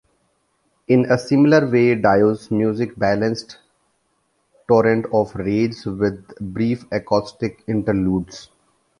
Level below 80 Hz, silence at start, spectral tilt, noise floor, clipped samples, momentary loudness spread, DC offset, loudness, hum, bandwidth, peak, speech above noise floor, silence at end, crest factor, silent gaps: -48 dBFS; 0.9 s; -7.5 dB/octave; -67 dBFS; under 0.1%; 13 LU; under 0.1%; -19 LUFS; none; 11.5 kHz; -2 dBFS; 49 dB; 0.6 s; 18 dB; none